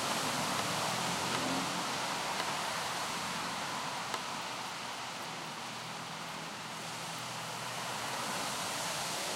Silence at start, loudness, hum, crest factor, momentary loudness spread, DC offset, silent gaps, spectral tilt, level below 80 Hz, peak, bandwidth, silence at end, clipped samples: 0 s; -36 LUFS; none; 20 dB; 8 LU; under 0.1%; none; -2 dB/octave; -72 dBFS; -18 dBFS; 16 kHz; 0 s; under 0.1%